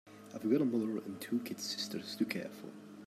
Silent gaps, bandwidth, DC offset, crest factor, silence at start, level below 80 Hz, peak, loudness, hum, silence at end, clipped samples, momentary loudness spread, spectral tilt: none; 15.5 kHz; under 0.1%; 18 dB; 0.05 s; -84 dBFS; -18 dBFS; -37 LUFS; none; 0 s; under 0.1%; 16 LU; -4.5 dB/octave